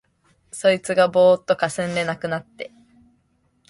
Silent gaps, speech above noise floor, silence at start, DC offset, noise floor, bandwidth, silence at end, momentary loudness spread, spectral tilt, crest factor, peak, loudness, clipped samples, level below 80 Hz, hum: none; 45 dB; 0.55 s; under 0.1%; -65 dBFS; 11.5 kHz; 1 s; 22 LU; -4.5 dB/octave; 18 dB; -4 dBFS; -20 LUFS; under 0.1%; -62 dBFS; none